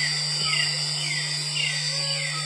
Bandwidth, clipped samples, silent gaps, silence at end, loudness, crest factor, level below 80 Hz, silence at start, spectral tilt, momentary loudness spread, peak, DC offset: 11 kHz; under 0.1%; none; 0 s; -23 LUFS; 14 dB; -66 dBFS; 0 s; -1.5 dB/octave; 3 LU; -12 dBFS; under 0.1%